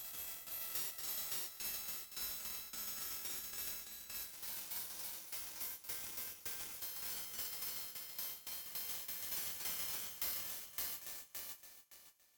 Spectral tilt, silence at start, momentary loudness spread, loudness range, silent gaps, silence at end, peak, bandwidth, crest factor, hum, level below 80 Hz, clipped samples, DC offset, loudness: 0.5 dB/octave; 0 s; 6 LU; 2 LU; none; 0.15 s; -24 dBFS; 19.5 kHz; 22 dB; none; -74 dBFS; under 0.1%; under 0.1%; -42 LUFS